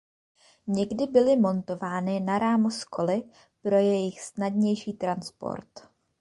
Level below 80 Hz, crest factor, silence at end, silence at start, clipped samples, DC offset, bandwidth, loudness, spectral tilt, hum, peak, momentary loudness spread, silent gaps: -66 dBFS; 18 dB; 0.4 s; 0.65 s; under 0.1%; under 0.1%; 11.5 kHz; -27 LUFS; -6.5 dB/octave; none; -8 dBFS; 12 LU; none